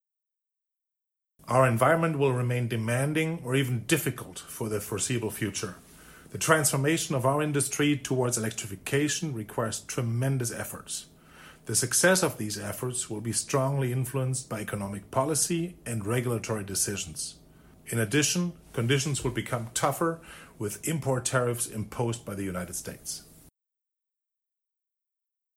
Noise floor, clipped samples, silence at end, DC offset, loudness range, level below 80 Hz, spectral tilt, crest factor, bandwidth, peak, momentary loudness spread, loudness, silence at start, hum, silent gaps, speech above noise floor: -84 dBFS; under 0.1%; 2.15 s; under 0.1%; 5 LU; -60 dBFS; -4 dB/octave; 22 dB; 16.5 kHz; -6 dBFS; 12 LU; -28 LUFS; 1.45 s; none; none; 55 dB